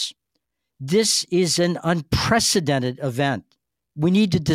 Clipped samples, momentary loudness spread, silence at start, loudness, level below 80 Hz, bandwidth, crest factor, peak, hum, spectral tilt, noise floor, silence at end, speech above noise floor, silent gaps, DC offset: under 0.1%; 7 LU; 0 s; -20 LUFS; -46 dBFS; 16 kHz; 16 dB; -6 dBFS; none; -4 dB/octave; -77 dBFS; 0 s; 57 dB; none; under 0.1%